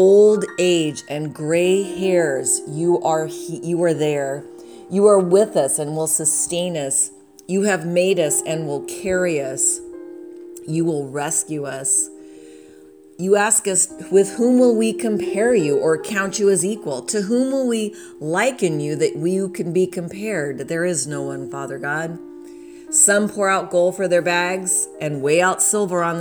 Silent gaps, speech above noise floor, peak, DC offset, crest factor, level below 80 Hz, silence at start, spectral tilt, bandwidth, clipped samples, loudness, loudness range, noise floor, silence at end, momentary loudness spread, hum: none; 26 dB; -2 dBFS; under 0.1%; 18 dB; -62 dBFS; 0 s; -4 dB/octave; over 20 kHz; under 0.1%; -19 LUFS; 5 LU; -45 dBFS; 0 s; 12 LU; none